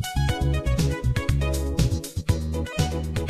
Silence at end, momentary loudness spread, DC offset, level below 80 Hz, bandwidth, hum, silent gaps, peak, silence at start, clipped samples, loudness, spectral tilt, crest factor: 0 s; 3 LU; under 0.1%; -28 dBFS; 14.5 kHz; none; none; -8 dBFS; 0 s; under 0.1%; -25 LUFS; -5.5 dB/octave; 16 dB